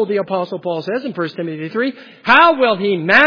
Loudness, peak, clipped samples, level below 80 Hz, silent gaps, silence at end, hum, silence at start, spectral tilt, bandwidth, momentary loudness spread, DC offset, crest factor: -16 LUFS; 0 dBFS; under 0.1%; -58 dBFS; none; 0 s; none; 0 s; -6.5 dB/octave; 5.4 kHz; 13 LU; under 0.1%; 16 dB